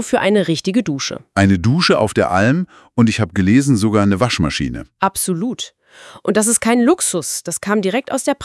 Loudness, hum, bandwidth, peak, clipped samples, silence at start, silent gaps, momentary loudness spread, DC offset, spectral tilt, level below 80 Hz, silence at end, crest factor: -16 LUFS; none; 12 kHz; 0 dBFS; under 0.1%; 0 s; none; 8 LU; under 0.1%; -4.5 dB/octave; -44 dBFS; 0 s; 16 dB